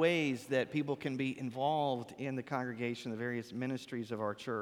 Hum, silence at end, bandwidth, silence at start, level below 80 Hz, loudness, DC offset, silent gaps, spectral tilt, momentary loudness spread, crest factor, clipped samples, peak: none; 0 s; 16.5 kHz; 0 s; -78 dBFS; -37 LUFS; under 0.1%; none; -6 dB/octave; 6 LU; 18 dB; under 0.1%; -18 dBFS